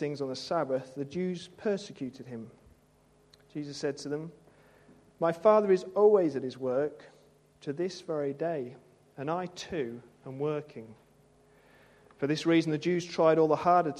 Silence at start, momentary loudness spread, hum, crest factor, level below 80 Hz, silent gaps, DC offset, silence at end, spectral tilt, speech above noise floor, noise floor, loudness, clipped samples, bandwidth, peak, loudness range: 0 s; 20 LU; none; 20 dB; -72 dBFS; none; under 0.1%; 0 s; -6.5 dB/octave; 35 dB; -64 dBFS; -30 LUFS; under 0.1%; 11 kHz; -10 dBFS; 10 LU